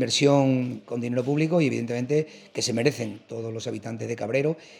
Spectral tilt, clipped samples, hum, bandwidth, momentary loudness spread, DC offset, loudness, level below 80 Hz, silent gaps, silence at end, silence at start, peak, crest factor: -5 dB/octave; under 0.1%; none; 15.5 kHz; 13 LU; under 0.1%; -26 LUFS; -74 dBFS; none; 0 s; 0 s; -4 dBFS; 20 dB